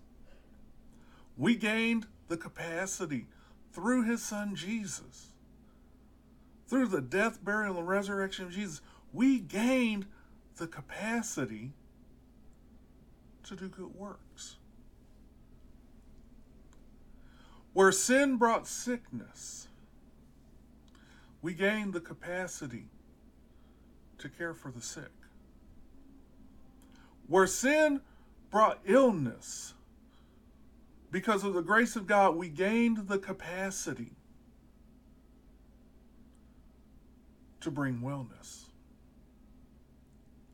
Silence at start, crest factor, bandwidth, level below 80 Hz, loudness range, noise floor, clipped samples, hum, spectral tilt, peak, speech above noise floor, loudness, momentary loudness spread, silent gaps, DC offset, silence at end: 0.25 s; 22 dB; 17.5 kHz; -62 dBFS; 16 LU; -60 dBFS; under 0.1%; none; -4.5 dB/octave; -12 dBFS; 28 dB; -31 LUFS; 21 LU; none; under 0.1%; 1.9 s